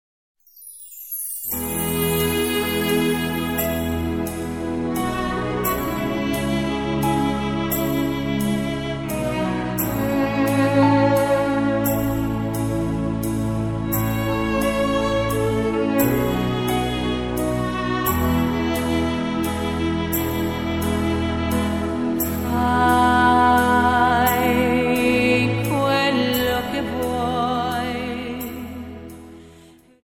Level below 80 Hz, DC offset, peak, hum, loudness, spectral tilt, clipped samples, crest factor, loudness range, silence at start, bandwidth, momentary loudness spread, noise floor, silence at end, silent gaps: -36 dBFS; 0.2%; -4 dBFS; none; -21 LUFS; -5.5 dB/octave; under 0.1%; 18 dB; 5 LU; 0.55 s; 17 kHz; 8 LU; -49 dBFS; 0.45 s; none